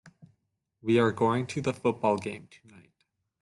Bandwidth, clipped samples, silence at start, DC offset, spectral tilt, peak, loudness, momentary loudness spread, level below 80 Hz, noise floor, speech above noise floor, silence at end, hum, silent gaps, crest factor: 11.5 kHz; under 0.1%; 0.05 s; under 0.1%; -6.5 dB/octave; -12 dBFS; -28 LUFS; 13 LU; -68 dBFS; -77 dBFS; 50 dB; 1 s; none; none; 18 dB